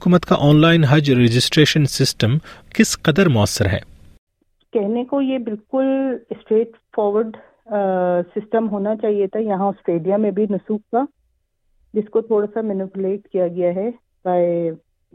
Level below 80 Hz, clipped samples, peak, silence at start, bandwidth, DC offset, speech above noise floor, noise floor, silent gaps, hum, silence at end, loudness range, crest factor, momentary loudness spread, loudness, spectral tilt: -48 dBFS; under 0.1%; -2 dBFS; 0 s; 16 kHz; under 0.1%; 48 dB; -66 dBFS; 4.18-4.27 s; none; 0.4 s; 7 LU; 18 dB; 11 LU; -19 LUFS; -6 dB/octave